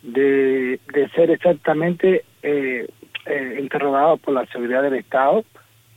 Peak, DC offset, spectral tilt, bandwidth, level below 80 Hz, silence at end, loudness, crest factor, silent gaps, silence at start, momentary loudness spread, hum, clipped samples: -4 dBFS; under 0.1%; -7.5 dB/octave; 16 kHz; -70 dBFS; 0.55 s; -19 LUFS; 14 dB; none; 0.05 s; 8 LU; none; under 0.1%